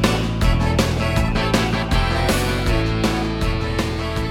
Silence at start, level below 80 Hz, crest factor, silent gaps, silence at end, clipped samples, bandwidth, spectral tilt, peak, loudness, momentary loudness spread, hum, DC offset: 0 s; -24 dBFS; 18 dB; none; 0 s; under 0.1%; 17 kHz; -5.5 dB/octave; -2 dBFS; -20 LUFS; 4 LU; none; under 0.1%